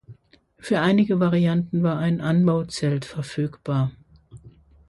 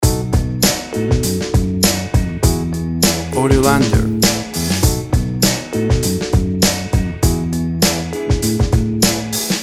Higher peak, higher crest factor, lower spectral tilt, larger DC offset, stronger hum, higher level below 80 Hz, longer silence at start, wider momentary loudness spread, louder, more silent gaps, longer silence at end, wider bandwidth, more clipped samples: second, -8 dBFS vs 0 dBFS; about the same, 16 dB vs 16 dB; first, -7.5 dB/octave vs -4.5 dB/octave; neither; neither; second, -56 dBFS vs -24 dBFS; about the same, 0.1 s vs 0 s; first, 9 LU vs 5 LU; second, -22 LUFS vs -16 LUFS; neither; first, 0.4 s vs 0 s; second, 11.5 kHz vs 17 kHz; neither